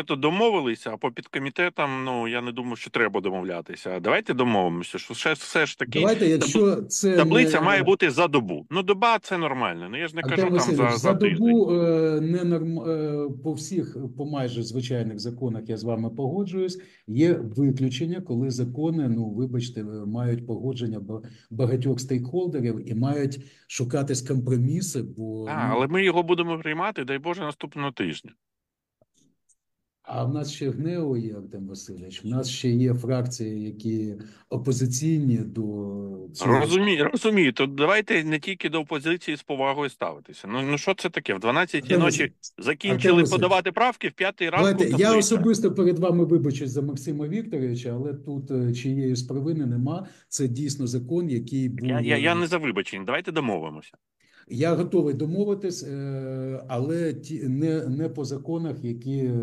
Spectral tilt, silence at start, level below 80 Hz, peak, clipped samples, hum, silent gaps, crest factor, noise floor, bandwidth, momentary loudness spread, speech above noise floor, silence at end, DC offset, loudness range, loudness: -5.5 dB/octave; 0 s; -68 dBFS; -6 dBFS; under 0.1%; none; none; 20 dB; -85 dBFS; 13 kHz; 12 LU; 61 dB; 0 s; under 0.1%; 8 LU; -25 LUFS